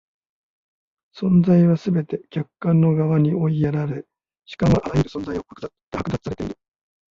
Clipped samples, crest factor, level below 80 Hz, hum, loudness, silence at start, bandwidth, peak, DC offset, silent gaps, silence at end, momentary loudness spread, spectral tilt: under 0.1%; 16 dB; -44 dBFS; none; -21 LUFS; 1.15 s; 7.2 kHz; -6 dBFS; under 0.1%; 5.83-5.91 s; 0.6 s; 16 LU; -9 dB/octave